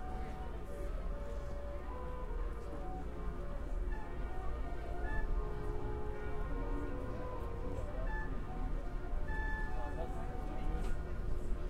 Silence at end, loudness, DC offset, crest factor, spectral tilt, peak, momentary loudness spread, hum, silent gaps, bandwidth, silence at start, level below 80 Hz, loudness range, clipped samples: 0 s; -44 LUFS; 0.4%; 14 dB; -7.5 dB/octave; -24 dBFS; 4 LU; none; none; 9.6 kHz; 0 s; -40 dBFS; 2 LU; under 0.1%